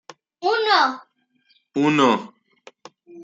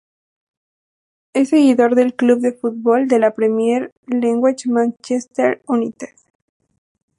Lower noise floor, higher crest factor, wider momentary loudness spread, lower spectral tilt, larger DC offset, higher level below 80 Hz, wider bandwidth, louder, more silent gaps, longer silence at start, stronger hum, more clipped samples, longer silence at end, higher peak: second, -64 dBFS vs under -90 dBFS; about the same, 18 dB vs 16 dB; about the same, 11 LU vs 10 LU; about the same, -4.5 dB/octave vs -5.5 dB/octave; neither; about the same, -74 dBFS vs -70 dBFS; second, 7.8 kHz vs 11.5 kHz; second, -20 LUFS vs -17 LUFS; second, none vs 3.92-4.03 s; second, 0.4 s vs 1.35 s; neither; neither; second, 0 s vs 1.15 s; about the same, -4 dBFS vs -2 dBFS